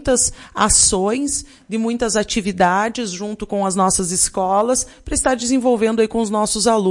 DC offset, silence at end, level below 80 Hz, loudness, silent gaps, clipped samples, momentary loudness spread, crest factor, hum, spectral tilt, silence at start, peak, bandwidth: under 0.1%; 0 s; -38 dBFS; -17 LUFS; none; under 0.1%; 8 LU; 18 dB; none; -3 dB/octave; 0 s; 0 dBFS; 11.5 kHz